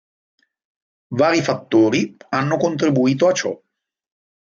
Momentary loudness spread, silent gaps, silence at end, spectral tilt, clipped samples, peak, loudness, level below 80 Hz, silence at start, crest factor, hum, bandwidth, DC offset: 8 LU; none; 1 s; -5.5 dB/octave; under 0.1%; -4 dBFS; -18 LUFS; -64 dBFS; 1.1 s; 16 dB; none; 7.4 kHz; under 0.1%